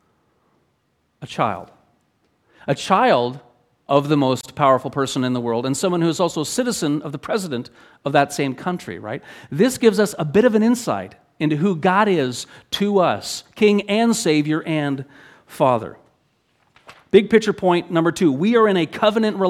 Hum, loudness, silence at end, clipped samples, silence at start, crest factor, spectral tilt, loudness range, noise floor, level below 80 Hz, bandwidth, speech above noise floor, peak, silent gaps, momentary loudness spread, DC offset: none; -19 LUFS; 0 s; under 0.1%; 1.2 s; 20 dB; -5.5 dB/octave; 4 LU; -67 dBFS; -60 dBFS; 15.5 kHz; 48 dB; 0 dBFS; none; 14 LU; under 0.1%